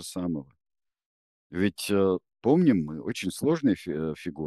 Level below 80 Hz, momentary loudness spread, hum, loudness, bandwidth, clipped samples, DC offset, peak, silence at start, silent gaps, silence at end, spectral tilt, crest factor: -60 dBFS; 11 LU; none; -27 LUFS; 12.5 kHz; under 0.1%; under 0.1%; -8 dBFS; 0 s; 1.06-1.50 s; 0 s; -6.5 dB/octave; 18 dB